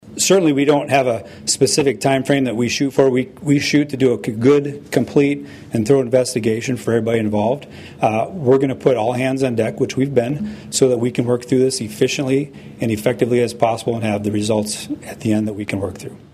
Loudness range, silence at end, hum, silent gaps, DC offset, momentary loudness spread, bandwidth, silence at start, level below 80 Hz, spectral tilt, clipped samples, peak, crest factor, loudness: 3 LU; 0.15 s; none; none; under 0.1%; 8 LU; 15 kHz; 0.05 s; -54 dBFS; -5 dB/octave; under 0.1%; -2 dBFS; 16 dB; -18 LUFS